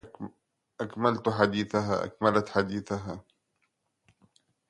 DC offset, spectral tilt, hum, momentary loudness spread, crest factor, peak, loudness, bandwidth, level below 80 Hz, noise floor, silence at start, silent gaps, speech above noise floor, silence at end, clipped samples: under 0.1%; -6.5 dB/octave; none; 18 LU; 24 dB; -6 dBFS; -28 LUFS; 11 kHz; -60 dBFS; -77 dBFS; 0.05 s; none; 49 dB; 1.5 s; under 0.1%